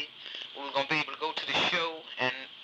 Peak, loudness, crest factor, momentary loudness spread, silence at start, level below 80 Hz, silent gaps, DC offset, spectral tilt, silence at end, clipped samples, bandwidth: -14 dBFS; -31 LUFS; 18 dB; 12 LU; 0 s; -76 dBFS; none; under 0.1%; -3 dB/octave; 0 s; under 0.1%; 10.5 kHz